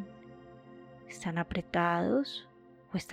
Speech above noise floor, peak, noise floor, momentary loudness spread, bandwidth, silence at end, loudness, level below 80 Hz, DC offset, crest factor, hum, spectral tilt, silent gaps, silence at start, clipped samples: 21 dB; -16 dBFS; -52 dBFS; 24 LU; 14.5 kHz; 0 s; -33 LUFS; -60 dBFS; under 0.1%; 20 dB; none; -6 dB/octave; none; 0 s; under 0.1%